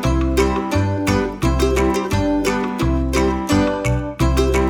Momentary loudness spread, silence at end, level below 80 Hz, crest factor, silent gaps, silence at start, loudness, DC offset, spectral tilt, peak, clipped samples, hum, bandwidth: 3 LU; 0 s; -24 dBFS; 14 dB; none; 0 s; -18 LUFS; under 0.1%; -6 dB/octave; -4 dBFS; under 0.1%; none; 19 kHz